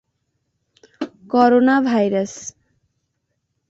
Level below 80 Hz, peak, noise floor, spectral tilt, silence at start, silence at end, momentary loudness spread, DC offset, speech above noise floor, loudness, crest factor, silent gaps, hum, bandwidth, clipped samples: -64 dBFS; -2 dBFS; -73 dBFS; -5.5 dB/octave; 1 s; 1.2 s; 19 LU; under 0.1%; 57 dB; -17 LUFS; 18 dB; none; none; 8 kHz; under 0.1%